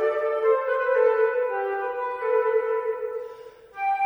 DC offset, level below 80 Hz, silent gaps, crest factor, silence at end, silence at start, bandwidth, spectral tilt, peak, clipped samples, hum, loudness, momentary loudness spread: under 0.1%; -70 dBFS; none; 14 dB; 0 s; 0 s; 4.7 kHz; -4.5 dB/octave; -10 dBFS; under 0.1%; none; -24 LUFS; 13 LU